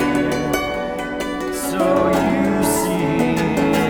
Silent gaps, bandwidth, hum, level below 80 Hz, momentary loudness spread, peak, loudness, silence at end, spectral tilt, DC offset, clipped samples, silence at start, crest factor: none; over 20 kHz; none; -40 dBFS; 7 LU; -4 dBFS; -19 LUFS; 0 s; -5 dB/octave; under 0.1%; under 0.1%; 0 s; 14 dB